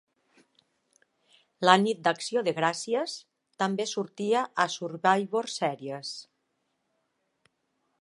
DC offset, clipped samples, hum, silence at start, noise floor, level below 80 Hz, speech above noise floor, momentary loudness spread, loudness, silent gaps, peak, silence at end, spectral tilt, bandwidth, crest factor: under 0.1%; under 0.1%; none; 1.6 s; -77 dBFS; -82 dBFS; 50 dB; 14 LU; -28 LUFS; none; -2 dBFS; 1.8 s; -4 dB/octave; 11.5 kHz; 28 dB